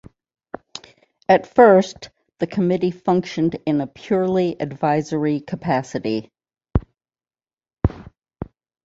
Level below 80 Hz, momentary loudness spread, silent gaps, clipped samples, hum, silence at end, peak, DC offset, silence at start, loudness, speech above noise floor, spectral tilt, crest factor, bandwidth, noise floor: -40 dBFS; 22 LU; 7.53-7.57 s; under 0.1%; none; 0.4 s; -2 dBFS; under 0.1%; 0.75 s; -20 LUFS; over 71 dB; -7 dB/octave; 20 dB; 7.8 kHz; under -90 dBFS